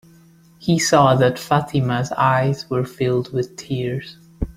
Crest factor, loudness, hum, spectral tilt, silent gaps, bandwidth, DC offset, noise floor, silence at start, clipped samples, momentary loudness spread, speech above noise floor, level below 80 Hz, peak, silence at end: 18 dB; -19 LUFS; none; -5.5 dB/octave; none; 15.5 kHz; under 0.1%; -50 dBFS; 0.6 s; under 0.1%; 13 LU; 31 dB; -42 dBFS; -2 dBFS; 0.05 s